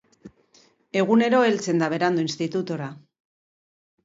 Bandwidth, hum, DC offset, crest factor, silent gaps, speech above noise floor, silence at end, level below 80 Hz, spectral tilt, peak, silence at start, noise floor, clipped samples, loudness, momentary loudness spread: 8 kHz; none; under 0.1%; 18 dB; none; 37 dB; 1.05 s; -70 dBFS; -5.5 dB/octave; -6 dBFS; 0.25 s; -59 dBFS; under 0.1%; -22 LUFS; 12 LU